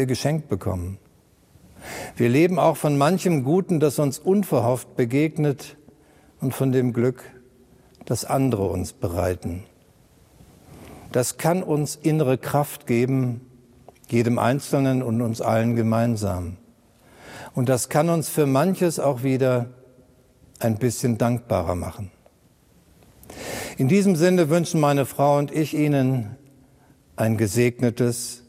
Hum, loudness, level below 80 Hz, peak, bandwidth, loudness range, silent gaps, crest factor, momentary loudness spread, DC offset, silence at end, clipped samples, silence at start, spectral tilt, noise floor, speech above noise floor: none; -22 LUFS; -54 dBFS; -4 dBFS; 16 kHz; 6 LU; none; 18 dB; 14 LU; under 0.1%; 0.1 s; under 0.1%; 0 s; -6.5 dB/octave; -57 dBFS; 36 dB